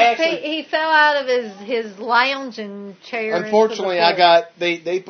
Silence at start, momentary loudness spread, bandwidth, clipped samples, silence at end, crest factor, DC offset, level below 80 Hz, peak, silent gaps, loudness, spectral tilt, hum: 0 s; 13 LU; 6.6 kHz; under 0.1%; 0 s; 18 dB; under 0.1%; -82 dBFS; 0 dBFS; none; -17 LUFS; -3.5 dB/octave; none